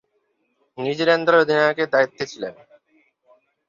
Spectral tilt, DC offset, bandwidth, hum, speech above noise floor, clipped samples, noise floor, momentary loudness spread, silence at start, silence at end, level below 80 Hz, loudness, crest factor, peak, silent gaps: -5 dB/octave; under 0.1%; 7.4 kHz; none; 50 dB; under 0.1%; -69 dBFS; 14 LU; 0.75 s; 1.15 s; -68 dBFS; -19 LUFS; 18 dB; -4 dBFS; none